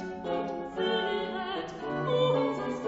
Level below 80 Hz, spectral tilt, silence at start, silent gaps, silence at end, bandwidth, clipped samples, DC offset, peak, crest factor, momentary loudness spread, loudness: -60 dBFS; -6 dB/octave; 0 s; none; 0 s; 8 kHz; under 0.1%; under 0.1%; -16 dBFS; 16 dB; 9 LU; -30 LUFS